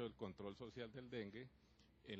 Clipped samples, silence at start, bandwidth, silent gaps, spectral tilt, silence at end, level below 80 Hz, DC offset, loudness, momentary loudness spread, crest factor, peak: under 0.1%; 0 s; 8.2 kHz; none; -7 dB/octave; 0 s; -74 dBFS; under 0.1%; -53 LUFS; 10 LU; 18 dB; -34 dBFS